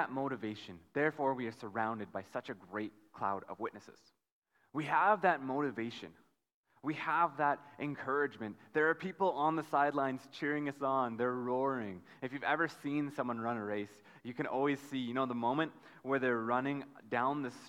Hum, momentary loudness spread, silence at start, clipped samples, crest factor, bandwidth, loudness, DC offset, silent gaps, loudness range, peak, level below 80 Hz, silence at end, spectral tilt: none; 12 LU; 0 s; under 0.1%; 20 dB; 15 kHz; -36 LUFS; under 0.1%; 4.32-4.42 s, 6.54-6.64 s; 4 LU; -16 dBFS; -82 dBFS; 0 s; -6.5 dB/octave